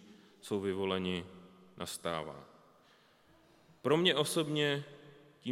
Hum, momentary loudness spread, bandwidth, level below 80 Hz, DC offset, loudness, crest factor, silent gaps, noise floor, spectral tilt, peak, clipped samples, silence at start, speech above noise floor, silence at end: none; 21 LU; 16.5 kHz; -78 dBFS; under 0.1%; -34 LUFS; 24 dB; none; -65 dBFS; -4.5 dB/octave; -14 dBFS; under 0.1%; 0 s; 32 dB; 0 s